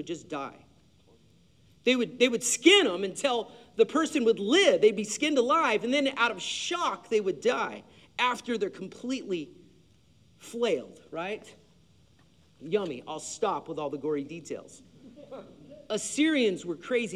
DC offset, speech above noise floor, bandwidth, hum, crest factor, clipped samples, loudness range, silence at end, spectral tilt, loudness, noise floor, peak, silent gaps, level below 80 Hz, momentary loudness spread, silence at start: under 0.1%; 34 dB; 14 kHz; none; 22 dB; under 0.1%; 11 LU; 0 s; -2.5 dB/octave; -27 LUFS; -62 dBFS; -6 dBFS; none; -72 dBFS; 18 LU; 0 s